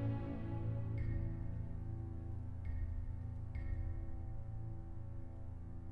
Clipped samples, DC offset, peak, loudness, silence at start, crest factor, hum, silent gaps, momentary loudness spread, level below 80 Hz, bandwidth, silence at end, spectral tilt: under 0.1%; under 0.1%; -28 dBFS; -45 LUFS; 0 s; 12 dB; none; none; 9 LU; -46 dBFS; 3.8 kHz; 0 s; -10.5 dB/octave